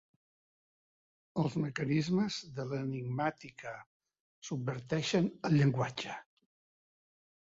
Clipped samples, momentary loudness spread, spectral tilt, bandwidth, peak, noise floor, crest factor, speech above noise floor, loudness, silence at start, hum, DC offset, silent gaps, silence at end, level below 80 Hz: under 0.1%; 16 LU; -6.5 dB/octave; 7.8 kHz; -18 dBFS; under -90 dBFS; 18 dB; over 56 dB; -34 LUFS; 1.35 s; none; under 0.1%; 3.86-4.00 s, 4.20-4.42 s; 1.2 s; -70 dBFS